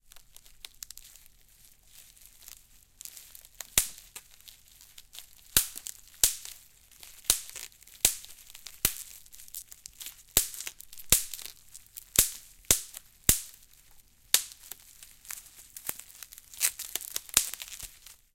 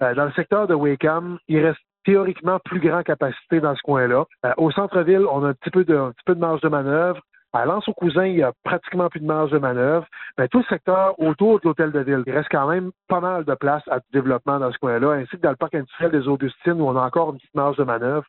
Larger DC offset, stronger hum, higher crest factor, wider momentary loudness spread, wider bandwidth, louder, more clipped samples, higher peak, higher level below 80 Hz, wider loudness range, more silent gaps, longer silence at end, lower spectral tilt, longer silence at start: neither; neither; first, 32 dB vs 16 dB; first, 24 LU vs 5 LU; first, 17 kHz vs 4.2 kHz; second, -28 LUFS vs -20 LUFS; neither; about the same, -2 dBFS vs -4 dBFS; first, -52 dBFS vs -60 dBFS; first, 8 LU vs 2 LU; neither; first, 0.2 s vs 0.05 s; second, 0 dB/octave vs -6 dB/octave; first, 0.15 s vs 0 s